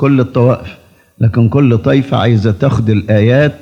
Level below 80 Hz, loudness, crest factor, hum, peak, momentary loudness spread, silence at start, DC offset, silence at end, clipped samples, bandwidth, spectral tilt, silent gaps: -42 dBFS; -11 LUFS; 10 dB; none; 0 dBFS; 4 LU; 0 s; under 0.1%; 0.05 s; under 0.1%; 6.8 kHz; -9 dB/octave; none